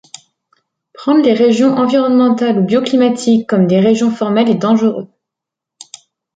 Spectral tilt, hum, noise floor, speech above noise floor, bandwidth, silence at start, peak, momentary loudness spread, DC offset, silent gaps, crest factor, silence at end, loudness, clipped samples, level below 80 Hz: -6.5 dB/octave; none; -82 dBFS; 71 dB; 9.2 kHz; 1 s; -2 dBFS; 3 LU; under 0.1%; none; 12 dB; 1.3 s; -12 LUFS; under 0.1%; -60 dBFS